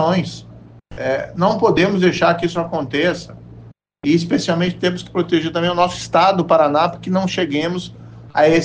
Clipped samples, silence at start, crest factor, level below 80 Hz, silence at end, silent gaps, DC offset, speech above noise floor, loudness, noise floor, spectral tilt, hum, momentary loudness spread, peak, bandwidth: under 0.1%; 0 s; 14 dB; -48 dBFS; 0 s; none; under 0.1%; 25 dB; -17 LUFS; -42 dBFS; -6 dB/octave; none; 10 LU; -2 dBFS; 9.4 kHz